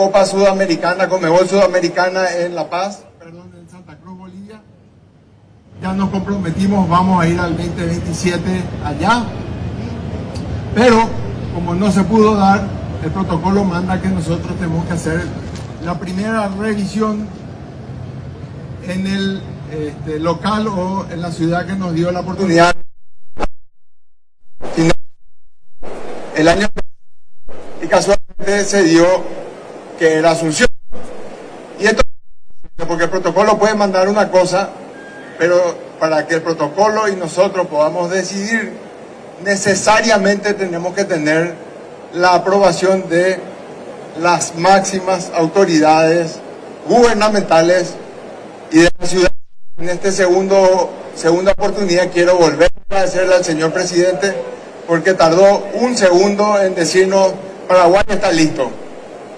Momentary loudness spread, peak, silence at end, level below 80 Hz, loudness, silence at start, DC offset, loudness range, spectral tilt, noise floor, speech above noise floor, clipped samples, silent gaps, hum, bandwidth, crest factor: 19 LU; -2 dBFS; 0 s; -36 dBFS; -14 LUFS; 0 s; under 0.1%; 8 LU; -5 dB/octave; -46 dBFS; 33 dB; under 0.1%; none; none; 11 kHz; 14 dB